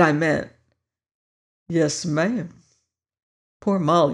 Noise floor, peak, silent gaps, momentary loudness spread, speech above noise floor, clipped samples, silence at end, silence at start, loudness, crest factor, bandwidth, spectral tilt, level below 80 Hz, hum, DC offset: -74 dBFS; -4 dBFS; 1.14-1.66 s, 3.23-3.60 s; 11 LU; 53 dB; under 0.1%; 0 s; 0 s; -22 LUFS; 20 dB; 11 kHz; -5.5 dB/octave; -60 dBFS; none; under 0.1%